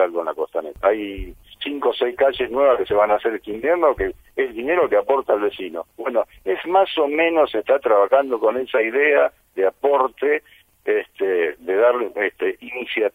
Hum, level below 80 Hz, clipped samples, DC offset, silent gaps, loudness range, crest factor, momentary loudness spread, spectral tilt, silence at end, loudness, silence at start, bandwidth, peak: none; -48 dBFS; under 0.1%; under 0.1%; none; 3 LU; 16 dB; 9 LU; -5.5 dB/octave; 0.05 s; -20 LUFS; 0 s; 16 kHz; -2 dBFS